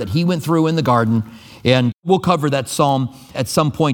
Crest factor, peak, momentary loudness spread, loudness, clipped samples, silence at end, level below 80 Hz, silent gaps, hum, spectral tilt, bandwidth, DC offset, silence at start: 16 dB; 0 dBFS; 6 LU; -17 LUFS; under 0.1%; 0 s; -50 dBFS; 1.94-2.03 s; none; -6 dB/octave; 19 kHz; under 0.1%; 0 s